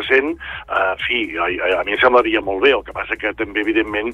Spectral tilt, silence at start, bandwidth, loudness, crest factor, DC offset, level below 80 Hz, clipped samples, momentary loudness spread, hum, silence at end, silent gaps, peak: -5.5 dB/octave; 0 s; 8.4 kHz; -18 LUFS; 16 dB; under 0.1%; -44 dBFS; under 0.1%; 9 LU; none; 0 s; none; -2 dBFS